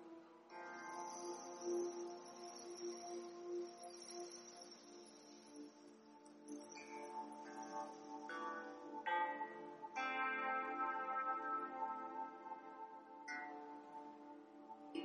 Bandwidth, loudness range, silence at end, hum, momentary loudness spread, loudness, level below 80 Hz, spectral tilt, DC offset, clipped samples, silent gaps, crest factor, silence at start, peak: 11.5 kHz; 11 LU; 0 s; none; 17 LU; -47 LUFS; under -90 dBFS; -2 dB/octave; under 0.1%; under 0.1%; none; 18 dB; 0 s; -30 dBFS